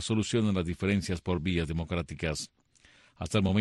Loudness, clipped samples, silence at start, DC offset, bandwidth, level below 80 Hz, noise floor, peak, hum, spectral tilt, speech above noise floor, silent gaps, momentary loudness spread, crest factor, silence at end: -31 LUFS; under 0.1%; 0 s; under 0.1%; 12 kHz; -48 dBFS; -61 dBFS; -14 dBFS; none; -5.5 dB/octave; 32 dB; none; 7 LU; 16 dB; 0 s